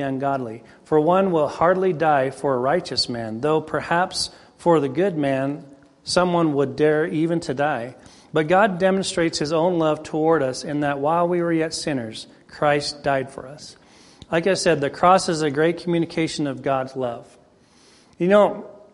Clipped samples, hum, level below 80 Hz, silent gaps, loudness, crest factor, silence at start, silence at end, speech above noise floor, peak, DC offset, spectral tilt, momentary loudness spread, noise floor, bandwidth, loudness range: under 0.1%; none; -56 dBFS; none; -21 LUFS; 18 dB; 0 s; 0.15 s; 33 dB; -2 dBFS; under 0.1%; -5 dB/octave; 11 LU; -54 dBFS; 11.5 kHz; 3 LU